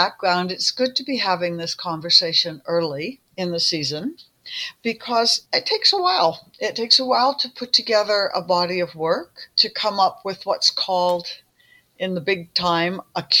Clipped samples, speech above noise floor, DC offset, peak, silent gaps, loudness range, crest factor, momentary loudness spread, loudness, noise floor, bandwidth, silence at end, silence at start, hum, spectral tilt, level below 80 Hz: under 0.1%; 35 dB; under 0.1%; -2 dBFS; none; 4 LU; 20 dB; 12 LU; -20 LUFS; -57 dBFS; 17 kHz; 0 s; 0 s; none; -3 dB/octave; -66 dBFS